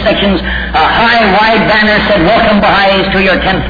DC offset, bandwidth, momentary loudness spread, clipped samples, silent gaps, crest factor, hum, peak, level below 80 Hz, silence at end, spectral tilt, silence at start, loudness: under 0.1%; 5 kHz; 4 LU; under 0.1%; none; 8 dB; none; 0 dBFS; -24 dBFS; 0 s; -6.5 dB/octave; 0 s; -8 LUFS